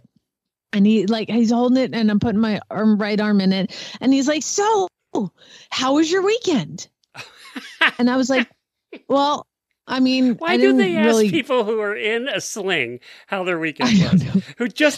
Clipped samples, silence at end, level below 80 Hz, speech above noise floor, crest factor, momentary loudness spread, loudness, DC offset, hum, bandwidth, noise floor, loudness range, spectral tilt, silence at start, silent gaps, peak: under 0.1%; 0 s; -56 dBFS; 63 dB; 18 dB; 11 LU; -19 LUFS; under 0.1%; none; 13 kHz; -82 dBFS; 3 LU; -5 dB/octave; 0.75 s; none; -2 dBFS